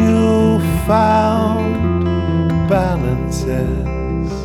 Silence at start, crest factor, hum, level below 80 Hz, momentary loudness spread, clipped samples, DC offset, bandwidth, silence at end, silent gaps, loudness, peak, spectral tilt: 0 s; 14 dB; none; -26 dBFS; 7 LU; under 0.1%; under 0.1%; 16.5 kHz; 0 s; none; -16 LUFS; -2 dBFS; -7.5 dB/octave